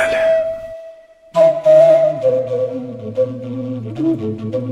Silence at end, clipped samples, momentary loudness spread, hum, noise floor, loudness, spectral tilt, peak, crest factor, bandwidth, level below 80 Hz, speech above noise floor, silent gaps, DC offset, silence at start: 0 s; under 0.1%; 15 LU; none; -40 dBFS; -16 LUFS; -7 dB/octave; -2 dBFS; 14 dB; 10.5 kHz; -54 dBFS; 19 dB; none; under 0.1%; 0 s